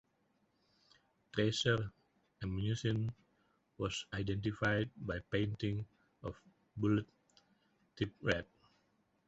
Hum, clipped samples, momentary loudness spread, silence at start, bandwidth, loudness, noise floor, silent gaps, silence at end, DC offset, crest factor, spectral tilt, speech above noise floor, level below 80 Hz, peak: none; under 0.1%; 14 LU; 1.35 s; 8 kHz; -38 LUFS; -77 dBFS; none; 0.85 s; under 0.1%; 22 dB; -5 dB/octave; 41 dB; -60 dBFS; -18 dBFS